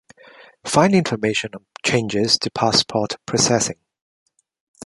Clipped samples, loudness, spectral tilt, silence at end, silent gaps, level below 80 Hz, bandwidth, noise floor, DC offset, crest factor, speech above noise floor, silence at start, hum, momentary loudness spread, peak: under 0.1%; -19 LUFS; -3.5 dB/octave; 1.1 s; none; -54 dBFS; 11.5 kHz; -47 dBFS; under 0.1%; 20 dB; 28 dB; 0.65 s; none; 8 LU; -2 dBFS